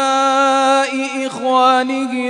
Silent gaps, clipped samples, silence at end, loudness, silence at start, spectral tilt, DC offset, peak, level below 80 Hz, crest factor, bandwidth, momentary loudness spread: none; under 0.1%; 0 s; -15 LUFS; 0 s; -2 dB/octave; under 0.1%; -2 dBFS; -70 dBFS; 14 dB; 11 kHz; 8 LU